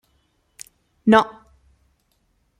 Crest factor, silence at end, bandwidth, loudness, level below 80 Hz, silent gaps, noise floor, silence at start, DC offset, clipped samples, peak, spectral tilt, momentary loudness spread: 22 dB; 1.3 s; 13.5 kHz; -18 LUFS; -60 dBFS; none; -67 dBFS; 1.05 s; under 0.1%; under 0.1%; -2 dBFS; -5.5 dB/octave; 26 LU